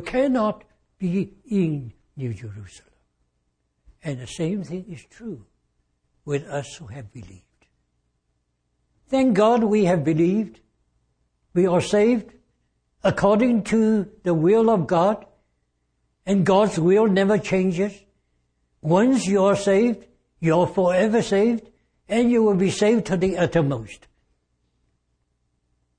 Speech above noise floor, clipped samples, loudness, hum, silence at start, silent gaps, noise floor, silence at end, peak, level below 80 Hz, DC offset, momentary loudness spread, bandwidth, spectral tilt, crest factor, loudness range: 52 dB; under 0.1%; -21 LUFS; 60 Hz at -50 dBFS; 0 s; none; -72 dBFS; 2.05 s; -6 dBFS; -54 dBFS; under 0.1%; 18 LU; 10 kHz; -6.5 dB/octave; 18 dB; 13 LU